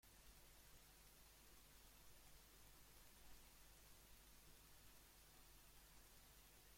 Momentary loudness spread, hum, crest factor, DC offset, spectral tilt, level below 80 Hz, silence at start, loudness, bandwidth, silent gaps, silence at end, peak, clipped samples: 1 LU; none; 18 dB; under 0.1%; -2 dB/octave; -72 dBFS; 0 s; -67 LUFS; 16.5 kHz; none; 0 s; -50 dBFS; under 0.1%